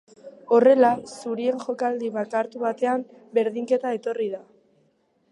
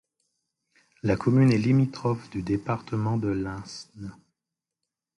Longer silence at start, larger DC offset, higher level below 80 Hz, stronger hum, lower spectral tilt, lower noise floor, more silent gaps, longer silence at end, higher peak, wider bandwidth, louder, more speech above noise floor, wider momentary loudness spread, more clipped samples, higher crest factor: second, 0.25 s vs 1.05 s; neither; second, -74 dBFS vs -54 dBFS; neither; second, -5.5 dB/octave vs -8 dB/octave; second, -66 dBFS vs -88 dBFS; neither; second, 0.9 s vs 1.05 s; about the same, -6 dBFS vs -8 dBFS; about the same, 11 kHz vs 11 kHz; about the same, -23 LUFS vs -25 LUFS; second, 43 dB vs 63 dB; second, 12 LU vs 20 LU; neither; about the same, 18 dB vs 18 dB